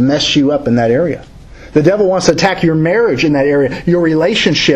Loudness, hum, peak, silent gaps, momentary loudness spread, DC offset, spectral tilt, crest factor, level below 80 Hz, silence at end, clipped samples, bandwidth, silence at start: -12 LUFS; none; 0 dBFS; none; 3 LU; under 0.1%; -5 dB/octave; 12 dB; -38 dBFS; 0 s; 0.1%; 11 kHz; 0 s